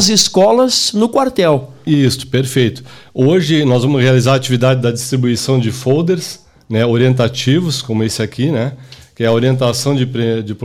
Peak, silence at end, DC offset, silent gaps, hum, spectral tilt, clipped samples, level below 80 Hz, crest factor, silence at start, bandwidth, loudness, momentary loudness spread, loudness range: 0 dBFS; 0 s; under 0.1%; none; none; -5 dB/octave; under 0.1%; -50 dBFS; 12 dB; 0 s; 16.5 kHz; -13 LUFS; 7 LU; 3 LU